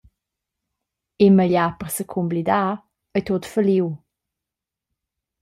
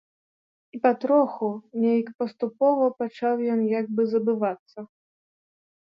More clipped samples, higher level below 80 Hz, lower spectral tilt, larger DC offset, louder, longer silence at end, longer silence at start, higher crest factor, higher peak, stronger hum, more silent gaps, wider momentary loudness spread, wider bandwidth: neither; first, -58 dBFS vs -80 dBFS; second, -6.5 dB/octave vs -9 dB/octave; neither; first, -20 LUFS vs -24 LUFS; first, 1.45 s vs 1.1 s; first, 1.2 s vs 0.75 s; about the same, 18 dB vs 18 dB; first, -4 dBFS vs -8 dBFS; neither; second, none vs 2.15-2.19 s, 4.59-4.66 s; about the same, 12 LU vs 10 LU; first, 15 kHz vs 5.8 kHz